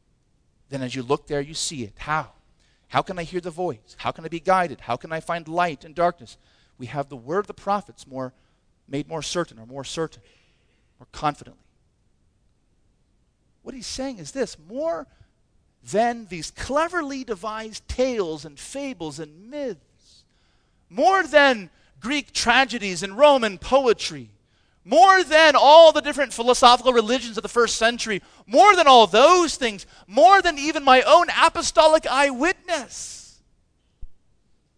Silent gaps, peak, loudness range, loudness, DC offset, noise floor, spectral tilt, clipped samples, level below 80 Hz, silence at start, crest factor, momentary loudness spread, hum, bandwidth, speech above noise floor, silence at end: none; 0 dBFS; 17 LU; -19 LUFS; under 0.1%; -65 dBFS; -3 dB/octave; under 0.1%; -50 dBFS; 0.7 s; 22 dB; 19 LU; none; 11 kHz; 44 dB; 0.65 s